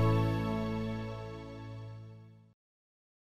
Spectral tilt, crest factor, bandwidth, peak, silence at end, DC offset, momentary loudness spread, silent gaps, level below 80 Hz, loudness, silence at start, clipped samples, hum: -8 dB/octave; 16 dB; 12 kHz; -18 dBFS; 0.9 s; under 0.1%; 19 LU; none; -52 dBFS; -36 LUFS; 0 s; under 0.1%; none